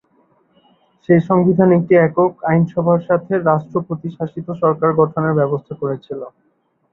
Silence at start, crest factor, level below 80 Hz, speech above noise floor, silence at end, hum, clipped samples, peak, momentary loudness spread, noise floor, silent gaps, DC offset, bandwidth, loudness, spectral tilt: 1.1 s; 16 dB; -58 dBFS; 42 dB; 0.65 s; none; under 0.1%; 0 dBFS; 14 LU; -58 dBFS; none; under 0.1%; 4 kHz; -16 LUFS; -11.5 dB/octave